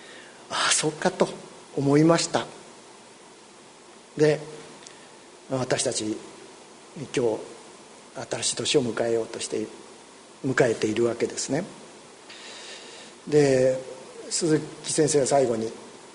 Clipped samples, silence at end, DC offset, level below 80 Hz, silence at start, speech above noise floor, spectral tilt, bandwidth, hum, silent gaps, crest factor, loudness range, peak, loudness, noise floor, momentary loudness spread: under 0.1%; 0.05 s; under 0.1%; -64 dBFS; 0 s; 25 dB; -4 dB/octave; 11 kHz; none; none; 22 dB; 6 LU; -6 dBFS; -25 LUFS; -49 dBFS; 24 LU